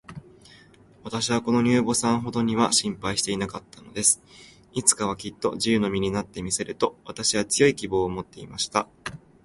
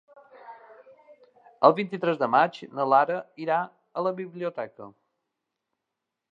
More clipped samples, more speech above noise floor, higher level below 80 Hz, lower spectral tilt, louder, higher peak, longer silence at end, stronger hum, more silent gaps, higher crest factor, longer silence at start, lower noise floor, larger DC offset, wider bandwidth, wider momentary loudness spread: neither; second, 28 dB vs 60 dB; first, -54 dBFS vs -86 dBFS; second, -3.5 dB/octave vs -7.5 dB/octave; about the same, -24 LUFS vs -25 LUFS; about the same, -2 dBFS vs -2 dBFS; second, 0.25 s vs 1.45 s; neither; neither; about the same, 24 dB vs 24 dB; second, 0.1 s vs 0.45 s; second, -53 dBFS vs -85 dBFS; neither; first, 12 kHz vs 7.6 kHz; about the same, 15 LU vs 13 LU